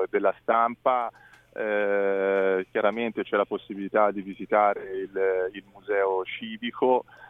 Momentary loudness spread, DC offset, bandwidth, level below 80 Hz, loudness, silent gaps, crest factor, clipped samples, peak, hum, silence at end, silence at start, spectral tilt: 10 LU; under 0.1%; 3.9 kHz; -68 dBFS; -26 LUFS; none; 18 dB; under 0.1%; -8 dBFS; none; 0 s; 0 s; -7.5 dB/octave